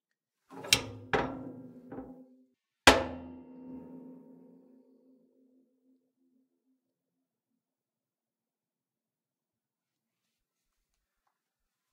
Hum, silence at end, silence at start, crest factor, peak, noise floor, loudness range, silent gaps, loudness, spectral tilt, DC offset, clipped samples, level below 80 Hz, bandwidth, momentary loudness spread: none; 7.75 s; 0.5 s; 34 dB; -4 dBFS; under -90 dBFS; 7 LU; none; -27 LUFS; -2.5 dB/octave; under 0.1%; under 0.1%; -56 dBFS; 15.5 kHz; 27 LU